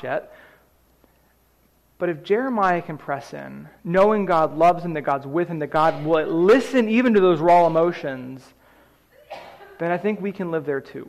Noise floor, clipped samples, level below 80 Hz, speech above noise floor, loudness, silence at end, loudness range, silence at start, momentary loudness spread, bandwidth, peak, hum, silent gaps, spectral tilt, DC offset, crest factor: -60 dBFS; under 0.1%; -58 dBFS; 40 dB; -20 LUFS; 0 s; 8 LU; 0 s; 20 LU; 13.5 kHz; -8 dBFS; none; none; -7 dB/octave; under 0.1%; 14 dB